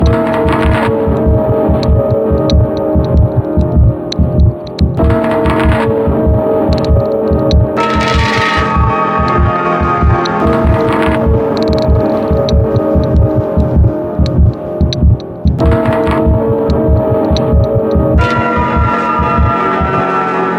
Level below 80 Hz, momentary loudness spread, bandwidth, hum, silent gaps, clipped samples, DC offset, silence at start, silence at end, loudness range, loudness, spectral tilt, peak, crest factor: -16 dBFS; 2 LU; 8.4 kHz; none; none; under 0.1%; under 0.1%; 0 s; 0 s; 1 LU; -11 LUFS; -8 dB/octave; 0 dBFS; 10 dB